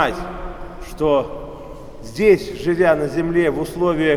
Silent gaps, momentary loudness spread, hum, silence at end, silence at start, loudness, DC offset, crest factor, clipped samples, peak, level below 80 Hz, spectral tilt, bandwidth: none; 19 LU; none; 0 s; 0 s; -18 LUFS; under 0.1%; 18 dB; under 0.1%; -2 dBFS; -38 dBFS; -6.5 dB/octave; 15 kHz